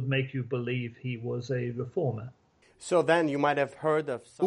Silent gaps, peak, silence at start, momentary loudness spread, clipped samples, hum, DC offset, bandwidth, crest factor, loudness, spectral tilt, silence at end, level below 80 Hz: none; -10 dBFS; 0 s; 12 LU; under 0.1%; none; under 0.1%; 11 kHz; 20 dB; -29 LUFS; -6.5 dB/octave; 0 s; -68 dBFS